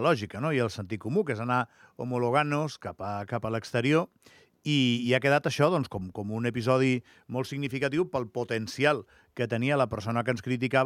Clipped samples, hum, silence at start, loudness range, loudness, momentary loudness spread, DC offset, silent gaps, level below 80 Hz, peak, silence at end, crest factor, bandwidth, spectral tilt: under 0.1%; none; 0 s; 3 LU; -28 LUFS; 10 LU; under 0.1%; none; -66 dBFS; -8 dBFS; 0 s; 20 dB; 14.5 kHz; -6 dB/octave